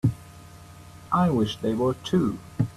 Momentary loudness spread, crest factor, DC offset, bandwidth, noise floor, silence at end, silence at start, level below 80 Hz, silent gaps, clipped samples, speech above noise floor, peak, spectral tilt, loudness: 24 LU; 16 dB; under 0.1%; 13.5 kHz; -46 dBFS; 0.05 s; 0.05 s; -52 dBFS; none; under 0.1%; 22 dB; -10 dBFS; -7.5 dB/octave; -25 LUFS